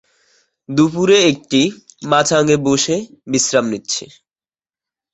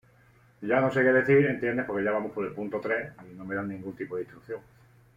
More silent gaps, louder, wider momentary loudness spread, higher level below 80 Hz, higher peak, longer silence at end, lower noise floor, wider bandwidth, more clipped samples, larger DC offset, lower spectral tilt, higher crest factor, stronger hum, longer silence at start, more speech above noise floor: neither; first, -15 LUFS vs -27 LUFS; second, 10 LU vs 18 LU; first, -56 dBFS vs -64 dBFS; first, 0 dBFS vs -10 dBFS; first, 1.1 s vs 0.55 s; first, under -90 dBFS vs -60 dBFS; first, 8.4 kHz vs 7.6 kHz; neither; neither; second, -3.5 dB/octave vs -8.5 dB/octave; about the same, 16 dB vs 18 dB; neither; about the same, 0.7 s vs 0.6 s; first, over 75 dB vs 32 dB